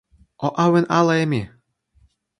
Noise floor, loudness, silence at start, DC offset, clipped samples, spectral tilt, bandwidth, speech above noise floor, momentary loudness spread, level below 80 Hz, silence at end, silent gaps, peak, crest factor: -60 dBFS; -19 LUFS; 0.4 s; under 0.1%; under 0.1%; -6.5 dB/octave; 11 kHz; 42 dB; 10 LU; -56 dBFS; 0.95 s; none; -2 dBFS; 18 dB